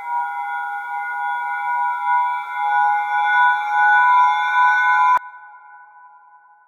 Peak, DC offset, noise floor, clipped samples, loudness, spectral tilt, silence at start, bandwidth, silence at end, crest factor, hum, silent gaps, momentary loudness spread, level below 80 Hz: -4 dBFS; under 0.1%; -49 dBFS; under 0.1%; -18 LUFS; 1.5 dB/octave; 0 s; 7 kHz; 0.6 s; 14 dB; none; none; 11 LU; -78 dBFS